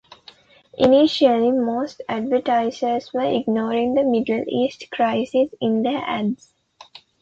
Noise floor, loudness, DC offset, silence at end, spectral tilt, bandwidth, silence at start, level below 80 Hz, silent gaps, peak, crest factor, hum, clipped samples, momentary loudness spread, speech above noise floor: -50 dBFS; -20 LUFS; under 0.1%; 0.85 s; -6 dB/octave; 7.8 kHz; 0.8 s; -58 dBFS; none; -4 dBFS; 18 dB; none; under 0.1%; 9 LU; 30 dB